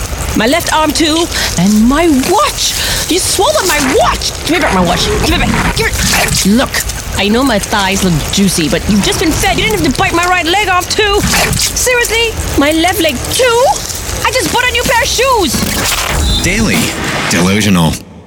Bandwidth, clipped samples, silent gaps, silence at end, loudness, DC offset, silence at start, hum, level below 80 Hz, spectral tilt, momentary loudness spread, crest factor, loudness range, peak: 19.5 kHz; under 0.1%; none; 0.05 s; -10 LUFS; under 0.1%; 0 s; none; -24 dBFS; -3.5 dB/octave; 3 LU; 10 dB; 1 LU; 0 dBFS